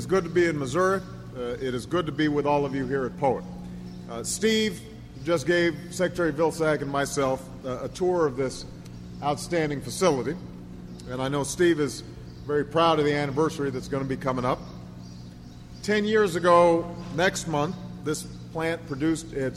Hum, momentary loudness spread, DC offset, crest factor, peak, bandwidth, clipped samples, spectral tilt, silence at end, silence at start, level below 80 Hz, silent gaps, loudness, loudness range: none; 18 LU; under 0.1%; 20 dB; -6 dBFS; 15.5 kHz; under 0.1%; -5 dB/octave; 0 s; 0 s; -50 dBFS; none; -26 LUFS; 4 LU